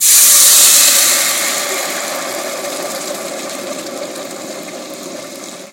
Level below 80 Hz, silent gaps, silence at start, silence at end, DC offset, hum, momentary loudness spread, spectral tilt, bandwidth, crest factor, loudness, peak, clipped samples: -64 dBFS; none; 0 s; 0 s; under 0.1%; none; 23 LU; 1.5 dB/octave; over 20 kHz; 14 dB; -9 LUFS; 0 dBFS; 0.2%